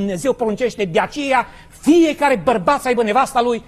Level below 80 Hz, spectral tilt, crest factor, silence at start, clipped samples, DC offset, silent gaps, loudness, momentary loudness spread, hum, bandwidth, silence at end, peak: -46 dBFS; -5 dB/octave; 14 dB; 0 s; under 0.1%; under 0.1%; none; -17 LUFS; 6 LU; none; 14 kHz; 0.05 s; -2 dBFS